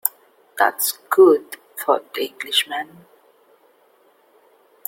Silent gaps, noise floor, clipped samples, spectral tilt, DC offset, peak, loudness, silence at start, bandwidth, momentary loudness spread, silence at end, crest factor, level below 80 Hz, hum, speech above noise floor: none; -57 dBFS; under 0.1%; -1.5 dB/octave; under 0.1%; 0 dBFS; -19 LUFS; 0.05 s; 17 kHz; 17 LU; 2.05 s; 22 dB; -74 dBFS; none; 38 dB